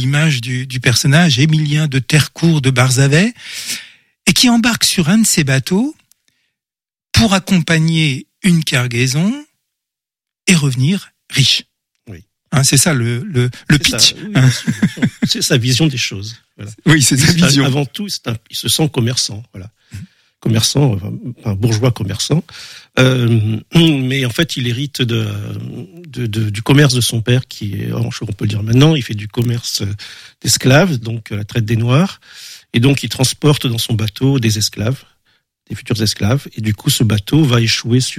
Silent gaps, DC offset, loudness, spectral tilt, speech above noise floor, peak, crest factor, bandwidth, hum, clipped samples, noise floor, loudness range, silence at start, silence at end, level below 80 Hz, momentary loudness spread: none; under 0.1%; -14 LUFS; -4.5 dB/octave; over 76 dB; 0 dBFS; 14 dB; 16 kHz; none; under 0.1%; under -90 dBFS; 4 LU; 0 s; 0 s; -42 dBFS; 13 LU